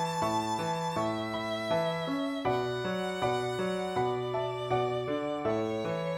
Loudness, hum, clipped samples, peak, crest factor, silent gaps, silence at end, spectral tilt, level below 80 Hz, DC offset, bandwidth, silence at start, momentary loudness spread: -32 LUFS; none; under 0.1%; -16 dBFS; 14 dB; none; 0 s; -5.5 dB/octave; -62 dBFS; under 0.1%; 18.5 kHz; 0 s; 3 LU